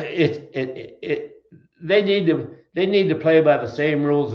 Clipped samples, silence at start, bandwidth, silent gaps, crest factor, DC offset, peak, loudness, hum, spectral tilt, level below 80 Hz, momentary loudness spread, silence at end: under 0.1%; 0 s; 6.6 kHz; none; 18 dB; under 0.1%; -4 dBFS; -20 LUFS; none; -8 dB/octave; -64 dBFS; 14 LU; 0 s